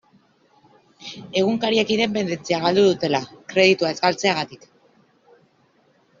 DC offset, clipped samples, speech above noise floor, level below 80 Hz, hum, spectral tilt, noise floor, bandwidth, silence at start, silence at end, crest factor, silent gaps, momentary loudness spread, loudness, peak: under 0.1%; under 0.1%; 41 dB; -62 dBFS; none; -3 dB/octave; -60 dBFS; 7.6 kHz; 1 s; 1.65 s; 20 dB; none; 11 LU; -20 LUFS; -2 dBFS